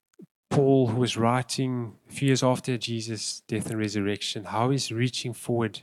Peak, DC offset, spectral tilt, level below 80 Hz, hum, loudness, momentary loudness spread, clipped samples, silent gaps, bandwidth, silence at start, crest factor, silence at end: -8 dBFS; under 0.1%; -5.5 dB/octave; -70 dBFS; none; -26 LUFS; 9 LU; under 0.1%; 0.31-0.43 s; 13.5 kHz; 0.2 s; 18 dB; 0 s